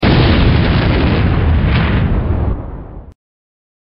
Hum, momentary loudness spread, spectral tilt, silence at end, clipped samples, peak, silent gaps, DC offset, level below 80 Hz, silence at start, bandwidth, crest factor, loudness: none; 15 LU; -11 dB/octave; 0.8 s; under 0.1%; 0 dBFS; none; under 0.1%; -18 dBFS; 0 s; 5.6 kHz; 12 dB; -13 LUFS